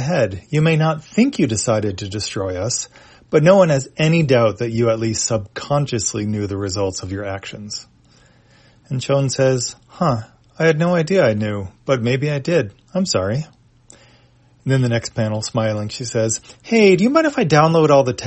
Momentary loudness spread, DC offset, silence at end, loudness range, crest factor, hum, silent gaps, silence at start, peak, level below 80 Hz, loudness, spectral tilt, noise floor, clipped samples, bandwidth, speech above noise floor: 13 LU; under 0.1%; 0 s; 6 LU; 18 dB; none; none; 0 s; 0 dBFS; -52 dBFS; -18 LUFS; -5.5 dB/octave; -52 dBFS; under 0.1%; 8.8 kHz; 35 dB